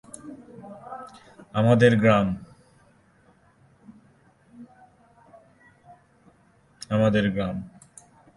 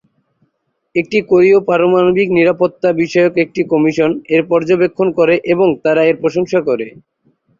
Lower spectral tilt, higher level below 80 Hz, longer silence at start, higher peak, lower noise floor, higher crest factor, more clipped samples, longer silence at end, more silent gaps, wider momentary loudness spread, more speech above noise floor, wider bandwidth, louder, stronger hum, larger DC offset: about the same, -7 dB/octave vs -7 dB/octave; about the same, -56 dBFS vs -54 dBFS; second, 0.25 s vs 0.95 s; about the same, -4 dBFS vs -2 dBFS; second, -60 dBFS vs -68 dBFS; first, 22 dB vs 12 dB; neither; about the same, 0.7 s vs 0.7 s; neither; first, 26 LU vs 5 LU; second, 40 dB vs 55 dB; first, 11.5 kHz vs 7.4 kHz; second, -22 LUFS vs -13 LUFS; neither; neither